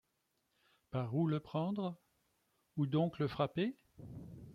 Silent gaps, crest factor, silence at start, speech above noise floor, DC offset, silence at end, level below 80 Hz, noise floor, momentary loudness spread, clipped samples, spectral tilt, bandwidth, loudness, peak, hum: none; 20 dB; 0.9 s; 45 dB; under 0.1%; 0 s; -70 dBFS; -82 dBFS; 17 LU; under 0.1%; -9 dB/octave; 5.8 kHz; -38 LUFS; -20 dBFS; none